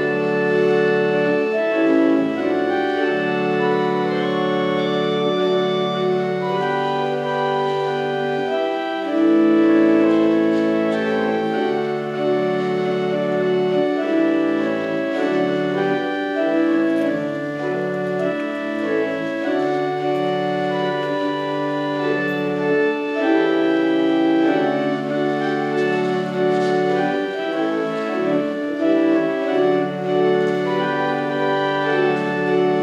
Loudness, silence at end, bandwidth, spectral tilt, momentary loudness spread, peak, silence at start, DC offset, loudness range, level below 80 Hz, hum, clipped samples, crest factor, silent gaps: -19 LUFS; 0 s; 8.8 kHz; -7 dB/octave; 5 LU; -4 dBFS; 0 s; under 0.1%; 4 LU; -74 dBFS; none; under 0.1%; 14 dB; none